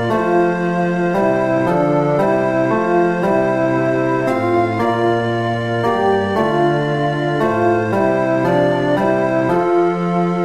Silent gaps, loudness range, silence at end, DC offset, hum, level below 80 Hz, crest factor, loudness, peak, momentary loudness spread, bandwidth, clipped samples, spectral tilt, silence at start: none; 1 LU; 0 s; 0.4%; none; -50 dBFS; 12 dB; -16 LUFS; -4 dBFS; 2 LU; 11.5 kHz; under 0.1%; -7.5 dB/octave; 0 s